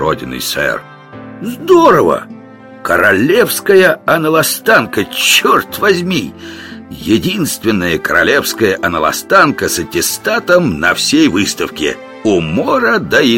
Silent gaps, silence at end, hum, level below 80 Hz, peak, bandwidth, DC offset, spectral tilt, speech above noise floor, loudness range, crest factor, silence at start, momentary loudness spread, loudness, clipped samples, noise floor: none; 0 s; none; -44 dBFS; 0 dBFS; 17.5 kHz; 0.1%; -3.5 dB/octave; 22 dB; 3 LU; 12 dB; 0 s; 12 LU; -11 LUFS; 0.4%; -34 dBFS